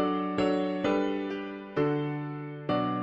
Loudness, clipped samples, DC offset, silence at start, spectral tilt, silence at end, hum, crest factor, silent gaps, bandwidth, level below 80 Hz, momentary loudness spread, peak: -30 LUFS; under 0.1%; under 0.1%; 0 s; -7.5 dB/octave; 0 s; none; 14 dB; none; 7.8 kHz; -62 dBFS; 8 LU; -16 dBFS